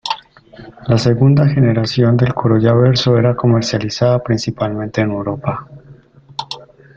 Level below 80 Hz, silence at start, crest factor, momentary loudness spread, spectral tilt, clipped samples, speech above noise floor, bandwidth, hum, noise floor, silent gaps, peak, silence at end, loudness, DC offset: -44 dBFS; 0.05 s; 14 dB; 15 LU; -7 dB/octave; under 0.1%; 29 dB; 7.6 kHz; none; -43 dBFS; none; 0 dBFS; 0.3 s; -14 LUFS; under 0.1%